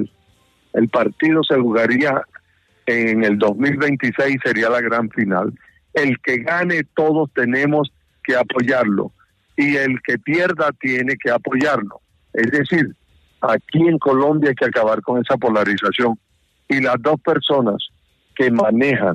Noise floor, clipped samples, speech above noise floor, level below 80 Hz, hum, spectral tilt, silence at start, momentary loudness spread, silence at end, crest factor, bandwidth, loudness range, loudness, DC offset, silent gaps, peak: -58 dBFS; under 0.1%; 42 dB; -60 dBFS; none; -7 dB/octave; 0 s; 8 LU; 0 s; 14 dB; 10.5 kHz; 2 LU; -18 LUFS; under 0.1%; none; -4 dBFS